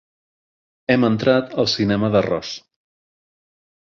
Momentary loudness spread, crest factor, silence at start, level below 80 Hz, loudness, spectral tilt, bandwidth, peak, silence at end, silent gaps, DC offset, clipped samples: 14 LU; 20 dB; 0.9 s; -52 dBFS; -19 LUFS; -6 dB/octave; 7.4 kHz; -2 dBFS; 1.3 s; none; under 0.1%; under 0.1%